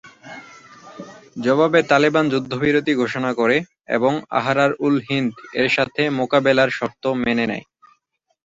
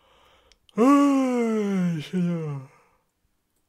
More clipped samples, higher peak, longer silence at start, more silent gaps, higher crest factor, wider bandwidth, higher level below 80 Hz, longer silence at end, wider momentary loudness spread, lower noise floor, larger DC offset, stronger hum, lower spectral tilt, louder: neither; first, -2 dBFS vs -8 dBFS; second, 0.05 s vs 0.75 s; neither; about the same, 18 dB vs 16 dB; second, 7.8 kHz vs 13.5 kHz; first, -58 dBFS vs -72 dBFS; second, 0.85 s vs 1.05 s; first, 19 LU vs 16 LU; about the same, -69 dBFS vs -72 dBFS; neither; neither; second, -6 dB/octave vs -7.5 dB/octave; first, -19 LUFS vs -23 LUFS